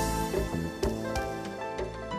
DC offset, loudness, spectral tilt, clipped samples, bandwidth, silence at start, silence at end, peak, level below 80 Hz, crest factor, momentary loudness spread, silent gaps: under 0.1%; -33 LUFS; -5 dB/octave; under 0.1%; 15.5 kHz; 0 s; 0 s; -18 dBFS; -40 dBFS; 14 dB; 6 LU; none